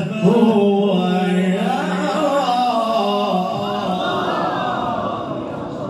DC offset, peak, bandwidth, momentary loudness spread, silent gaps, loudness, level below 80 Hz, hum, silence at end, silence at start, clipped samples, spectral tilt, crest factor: under 0.1%; -2 dBFS; 12.5 kHz; 8 LU; none; -18 LUFS; -56 dBFS; none; 0 s; 0 s; under 0.1%; -6.5 dB/octave; 16 dB